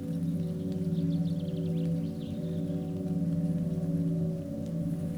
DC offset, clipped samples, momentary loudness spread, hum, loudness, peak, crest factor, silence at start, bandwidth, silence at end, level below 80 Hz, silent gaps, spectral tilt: under 0.1%; under 0.1%; 4 LU; none; -32 LUFS; -20 dBFS; 10 dB; 0 s; 10.5 kHz; 0 s; -58 dBFS; none; -9.5 dB/octave